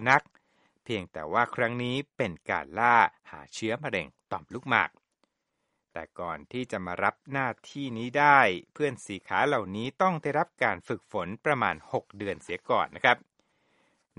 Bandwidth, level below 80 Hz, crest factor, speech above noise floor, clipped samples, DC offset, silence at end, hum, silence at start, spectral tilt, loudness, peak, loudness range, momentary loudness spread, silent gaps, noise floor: 11 kHz; -66 dBFS; 24 dB; 52 dB; under 0.1%; under 0.1%; 1 s; none; 0 s; -5 dB/octave; -28 LUFS; -4 dBFS; 7 LU; 14 LU; none; -80 dBFS